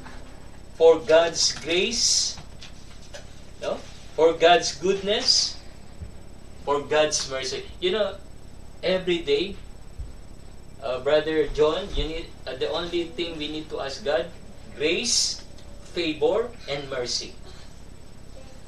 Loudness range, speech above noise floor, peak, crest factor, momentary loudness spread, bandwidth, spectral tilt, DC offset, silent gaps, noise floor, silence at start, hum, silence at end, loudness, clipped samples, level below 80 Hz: 6 LU; 20 dB; -4 dBFS; 20 dB; 24 LU; 13 kHz; -2.5 dB/octave; 0.8%; none; -44 dBFS; 0 s; none; 0.05 s; -23 LUFS; under 0.1%; -42 dBFS